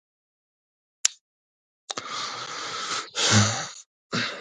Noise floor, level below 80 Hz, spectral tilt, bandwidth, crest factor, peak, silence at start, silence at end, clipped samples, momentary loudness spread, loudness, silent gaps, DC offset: under -90 dBFS; -58 dBFS; -2.5 dB/octave; 11.5 kHz; 28 dB; 0 dBFS; 1.05 s; 0 s; under 0.1%; 15 LU; -26 LUFS; 1.21-1.88 s, 3.86-4.10 s; under 0.1%